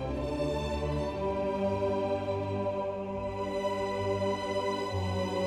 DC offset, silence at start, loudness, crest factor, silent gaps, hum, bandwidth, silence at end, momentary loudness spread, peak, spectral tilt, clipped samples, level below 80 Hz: under 0.1%; 0 s; -32 LUFS; 12 dB; none; none; 13.5 kHz; 0 s; 4 LU; -20 dBFS; -6.5 dB/octave; under 0.1%; -46 dBFS